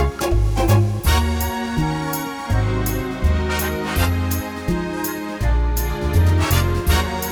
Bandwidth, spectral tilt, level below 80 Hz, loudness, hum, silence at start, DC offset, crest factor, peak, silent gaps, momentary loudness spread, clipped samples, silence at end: over 20 kHz; -5.5 dB/octave; -24 dBFS; -20 LUFS; none; 0 s; under 0.1%; 14 dB; -4 dBFS; none; 7 LU; under 0.1%; 0 s